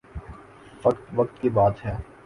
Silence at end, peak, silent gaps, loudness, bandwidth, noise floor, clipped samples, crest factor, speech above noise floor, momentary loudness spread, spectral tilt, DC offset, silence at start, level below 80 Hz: 0.2 s; -6 dBFS; none; -24 LUFS; 11 kHz; -47 dBFS; under 0.1%; 20 dB; 23 dB; 21 LU; -9.5 dB/octave; under 0.1%; 0.15 s; -44 dBFS